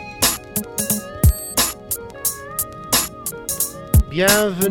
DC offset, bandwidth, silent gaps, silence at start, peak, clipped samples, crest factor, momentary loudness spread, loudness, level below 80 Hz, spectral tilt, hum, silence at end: under 0.1%; over 20 kHz; none; 0 s; -2 dBFS; under 0.1%; 18 dB; 10 LU; -19 LUFS; -28 dBFS; -3.5 dB/octave; none; 0 s